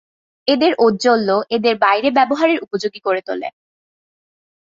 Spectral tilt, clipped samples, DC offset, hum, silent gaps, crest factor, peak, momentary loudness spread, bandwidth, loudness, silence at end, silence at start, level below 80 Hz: -4.5 dB/octave; under 0.1%; under 0.1%; none; none; 16 dB; -2 dBFS; 10 LU; 7.8 kHz; -16 LUFS; 1.15 s; 0.45 s; -62 dBFS